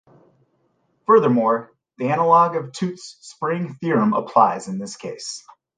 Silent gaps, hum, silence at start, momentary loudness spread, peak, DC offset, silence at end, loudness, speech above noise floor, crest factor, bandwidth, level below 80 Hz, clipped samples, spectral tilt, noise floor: none; none; 1.1 s; 16 LU; -2 dBFS; under 0.1%; 0.4 s; -20 LUFS; 47 dB; 18 dB; 9.6 kHz; -70 dBFS; under 0.1%; -6 dB/octave; -66 dBFS